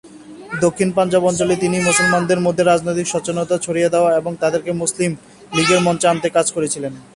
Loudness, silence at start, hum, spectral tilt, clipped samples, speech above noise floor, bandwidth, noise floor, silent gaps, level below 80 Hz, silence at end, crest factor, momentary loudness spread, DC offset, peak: -17 LUFS; 0.05 s; none; -4 dB/octave; under 0.1%; 20 dB; 11.5 kHz; -37 dBFS; none; -52 dBFS; 0.15 s; 16 dB; 7 LU; under 0.1%; -2 dBFS